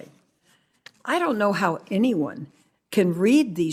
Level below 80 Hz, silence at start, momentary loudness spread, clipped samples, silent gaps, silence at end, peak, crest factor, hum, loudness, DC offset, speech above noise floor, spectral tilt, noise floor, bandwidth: -70 dBFS; 0 s; 14 LU; under 0.1%; none; 0 s; -6 dBFS; 18 dB; none; -23 LUFS; under 0.1%; 42 dB; -6 dB/octave; -64 dBFS; 16 kHz